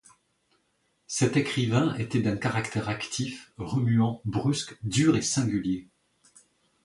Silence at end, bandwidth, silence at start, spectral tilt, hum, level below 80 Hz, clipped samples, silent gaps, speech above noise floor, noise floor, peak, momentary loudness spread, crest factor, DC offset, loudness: 1 s; 11.5 kHz; 1.1 s; -5 dB/octave; none; -56 dBFS; under 0.1%; none; 46 dB; -72 dBFS; -8 dBFS; 9 LU; 20 dB; under 0.1%; -27 LUFS